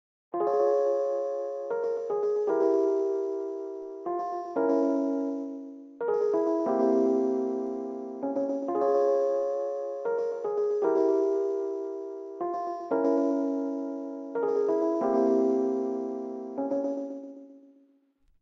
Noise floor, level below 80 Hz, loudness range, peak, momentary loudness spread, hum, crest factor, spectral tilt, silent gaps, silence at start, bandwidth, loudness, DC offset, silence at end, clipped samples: -66 dBFS; -82 dBFS; 3 LU; -14 dBFS; 11 LU; none; 14 dB; -7 dB/octave; none; 0.35 s; 7.2 kHz; -28 LUFS; under 0.1%; 0.85 s; under 0.1%